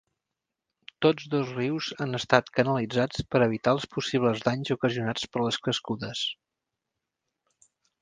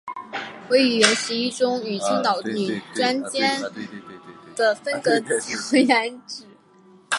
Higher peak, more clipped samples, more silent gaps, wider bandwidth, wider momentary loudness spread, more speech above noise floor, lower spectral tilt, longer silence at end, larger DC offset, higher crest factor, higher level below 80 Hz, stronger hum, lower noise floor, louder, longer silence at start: about the same, -4 dBFS vs -2 dBFS; neither; neither; second, 9.8 kHz vs 11.5 kHz; second, 7 LU vs 18 LU; first, 60 dB vs 30 dB; first, -5.5 dB/octave vs -2.5 dB/octave; first, 1.7 s vs 0 s; neither; about the same, 26 dB vs 22 dB; first, -60 dBFS vs -72 dBFS; neither; first, -86 dBFS vs -52 dBFS; second, -27 LUFS vs -21 LUFS; first, 1 s vs 0.05 s